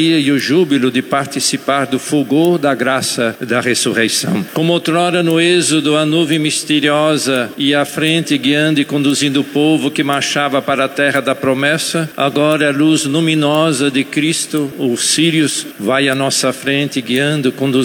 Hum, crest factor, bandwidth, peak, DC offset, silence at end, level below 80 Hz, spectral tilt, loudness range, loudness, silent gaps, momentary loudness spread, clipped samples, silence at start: none; 14 dB; 19 kHz; 0 dBFS; under 0.1%; 0 s; -64 dBFS; -4 dB/octave; 1 LU; -14 LUFS; none; 4 LU; under 0.1%; 0 s